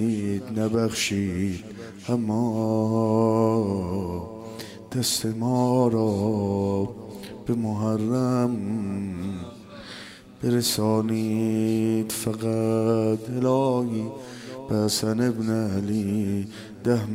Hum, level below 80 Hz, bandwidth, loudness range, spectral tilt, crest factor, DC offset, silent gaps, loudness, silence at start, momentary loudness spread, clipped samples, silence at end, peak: none; -58 dBFS; 16 kHz; 3 LU; -6 dB/octave; 16 dB; under 0.1%; none; -25 LUFS; 0 s; 15 LU; under 0.1%; 0 s; -8 dBFS